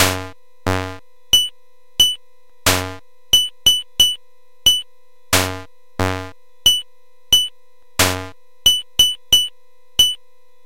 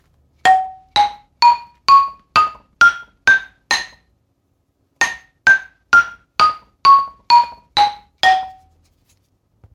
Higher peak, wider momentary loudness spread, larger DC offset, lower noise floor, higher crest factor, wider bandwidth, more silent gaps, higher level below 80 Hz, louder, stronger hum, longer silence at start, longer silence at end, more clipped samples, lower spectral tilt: about the same, 0 dBFS vs 0 dBFS; first, 15 LU vs 8 LU; first, 2% vs under 0.1%; second, -59 dBFS vs -65 dBFS; about the same, 20 dB vs 16 dB; first, 17 kHz vs 14.5 kHz; neither; first, -42 dBFS vs -54 dBFS; about the same, -16 LUFS vs -15 LUFS; neither; second, 0 s vs 0.45 s; second, 0.5 s vs 1.25 s; neither; about the same, -1 dB/octave vs 0 dB/octave